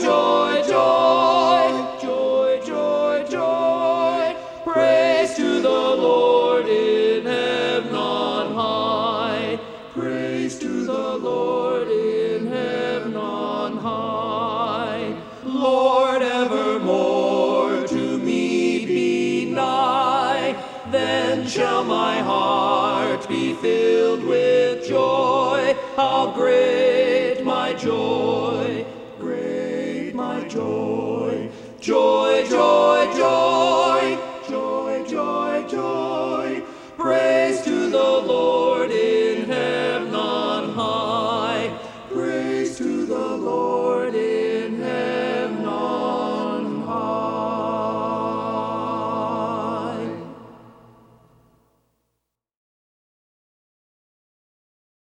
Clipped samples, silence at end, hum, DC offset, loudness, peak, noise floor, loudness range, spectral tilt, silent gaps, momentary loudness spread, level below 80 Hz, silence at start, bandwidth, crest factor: under 0.1%; 4.35 s; none; under 0.1%; -21 LUFS; -4 dBFS; -78 dBFS; 6 LU; -5 dB/octave; none; 9 LU; -62 dBFS; 0 s; 10 kHz; 18 dB